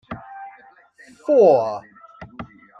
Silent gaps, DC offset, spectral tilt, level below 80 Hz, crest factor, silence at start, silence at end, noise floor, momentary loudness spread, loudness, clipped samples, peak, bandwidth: none; under 0.1%; -7.5 dB/octave; -58 dBFS; 18 dB; 0.1 s; 0.35 s; -50 dBFS; 26 LU; -16 LUFS; under 0.1%; -4 dBFS; 7.8 kHz